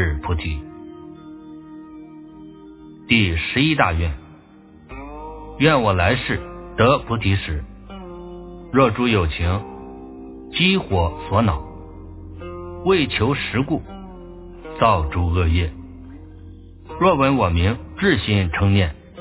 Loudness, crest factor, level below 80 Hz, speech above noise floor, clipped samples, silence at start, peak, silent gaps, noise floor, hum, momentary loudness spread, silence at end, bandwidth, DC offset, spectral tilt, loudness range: -19 LUFS; 20 dB; -30 dBFS; 28 dB; under 0.1%; 0 s; 0 dBFS; none; -46 dBFS; none; 22 LU; 0 s; 4 kHz; under 0.1%; -10.5 dB/octave; 3 LU